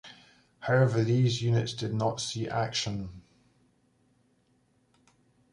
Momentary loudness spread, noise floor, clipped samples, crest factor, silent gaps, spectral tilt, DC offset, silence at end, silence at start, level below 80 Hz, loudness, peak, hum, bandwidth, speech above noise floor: 14 LU; -69 dBFS; under 0.1%; 18 dB; none; -5.5 dB/octave; under 0.1%; 2.35 s; 0.05 s; -60 dBFS; -29 LUFS; -12 dBFS; none; 11 kHz; 41 dB